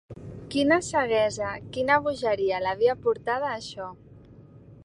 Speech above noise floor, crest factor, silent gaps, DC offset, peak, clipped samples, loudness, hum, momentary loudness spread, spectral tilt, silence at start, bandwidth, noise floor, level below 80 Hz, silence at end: 24 dB; 20 dB; none; under 0.1%; -6 dBFS; under 0.1%; -25 LUFS; none; 15 LU; -4.5 dB/octave; 0.1 s; 11.5 kHz; -49 dBFS; -56 dBFS; 0.05 s